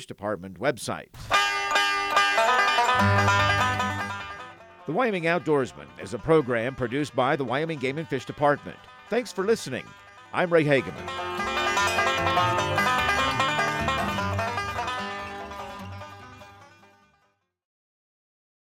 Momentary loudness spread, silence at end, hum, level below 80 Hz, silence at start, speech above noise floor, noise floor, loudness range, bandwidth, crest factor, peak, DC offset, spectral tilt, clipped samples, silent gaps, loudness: 16 LU; 1.95 s; none; -52 dBFS; 0 s; 44 dB; -70 dBFS; 10 LU; 16.5 kHz; 20 dB; -8 dBFS; under 0.1%; -4.5 dB/octave; under 0.1%; none; -24 LUFS